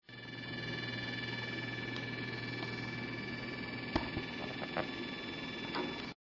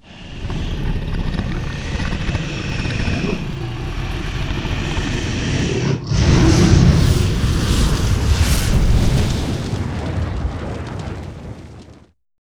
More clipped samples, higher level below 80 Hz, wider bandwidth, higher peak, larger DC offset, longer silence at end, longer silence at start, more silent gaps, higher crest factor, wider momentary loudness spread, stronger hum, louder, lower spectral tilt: neither; second, -60 dBFS vs -22 dBFS; second, 6 kHz vs over 20 kHz; second, -18 dBFS vs 0 dBFS; neither; second, 0.2 s vs 0.55 s; about the same, 0.1 s vs 0.1 s; neither; first, 24 dB vs 18 dB; second, 3 LU vs 14 LU; neither; second, -40 LUFS vs -19 LUFS; about the same, -5.5 dB/octave vs -5.5 dB/octave